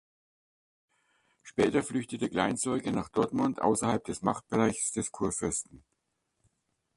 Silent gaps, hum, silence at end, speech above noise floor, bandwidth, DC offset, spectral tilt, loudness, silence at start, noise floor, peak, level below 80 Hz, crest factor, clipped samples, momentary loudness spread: none; none; 1.2 s; 50 dB; 11.5 kHz; under 0.1%; -4.5 dB/octave; -30 LUFS; 1.45 s; -80 dBFS; -10 dBFS; -60 dBFS; 22 dB; under 0.1%; 5 LU